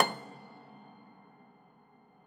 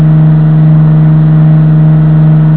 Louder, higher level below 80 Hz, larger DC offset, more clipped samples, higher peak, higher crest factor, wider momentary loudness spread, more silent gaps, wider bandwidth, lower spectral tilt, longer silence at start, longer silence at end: second, -36 LUFS vs -5 LUFS; second, -86 dBFS vs -32 dBFS; second, under 0.1% vs 3%; second, under 0.1% vs 6%; second, -6 dBFS vs 0 dBFS; first, 32 dB vs 4 dB; first, 18 LU vs 0 LU; neither; first, 19.5 kHz vs 4 kHz; second, -3.5 dB/octave vs -13.5 dB/octave; about the same, 0 s vs 0 s; first, 1.8 s vs 0 s